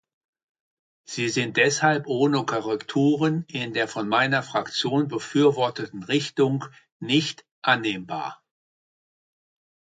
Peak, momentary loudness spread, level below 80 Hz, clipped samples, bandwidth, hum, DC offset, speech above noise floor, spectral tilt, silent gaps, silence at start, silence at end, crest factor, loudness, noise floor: -4 dBFS; 11 LU; -70 dBFS; under 0.1%; 9.4 kHz; none; under 0.1%; over 66 dB; -4.5 dB/octave; 6.92-7.00 s, 7.51-7.62 s; 1.1 s; 1.65 s; 20 dB; -24 LUFS; under -90 dBFS